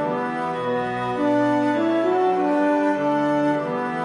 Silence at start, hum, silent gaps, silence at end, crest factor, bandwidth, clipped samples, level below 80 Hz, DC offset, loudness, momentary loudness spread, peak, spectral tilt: 0 s; none; none; 0 s; 10 dB; 10 kHz; under 0.1%; -62 dBFS; under 0.1%; -21 LUFS; 5 LU; -10 dBFS; -7 dB/octave